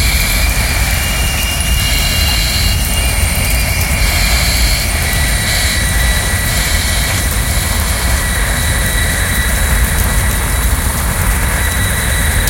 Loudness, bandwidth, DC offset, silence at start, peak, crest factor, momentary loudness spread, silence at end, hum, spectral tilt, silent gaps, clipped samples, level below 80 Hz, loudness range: -13 LUFS; 17.5 kHz; under 0.1%; 0 s; 0 dBFS; 12 dB; 2 LU; 0 s; none; -3 dB/octave; none; under 0.1%; -16 dBFS; 1 LU